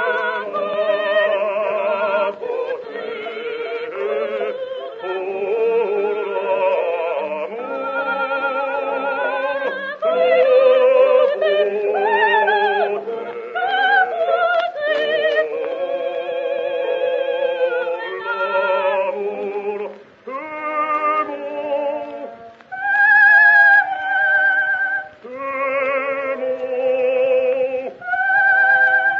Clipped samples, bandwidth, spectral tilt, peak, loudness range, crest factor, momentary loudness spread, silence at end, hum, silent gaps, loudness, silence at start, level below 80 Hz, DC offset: under 0.1%; 5.6 kHz; 1 dB/octave; -2 dBFS; 9 LU; 16 dB; 13 LU; 0 s; none; none; -18 LUFS; 0 s; -74 dBFS; under 0.1%